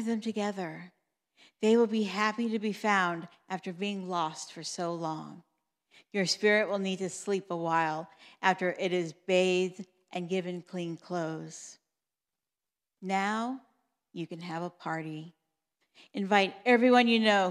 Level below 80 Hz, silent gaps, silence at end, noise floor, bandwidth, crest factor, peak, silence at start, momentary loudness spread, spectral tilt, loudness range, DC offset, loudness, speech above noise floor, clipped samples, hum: under -90 dBFS; none; 0 s; under -90 dBFS; 12.5 kHz; 22 dB; -10 dBFS; 0 s; 16 LU; -4.5 dB/octave; 8 LU; under 0.1%; -30 LUFS; over 60 dB; under 0.1%; none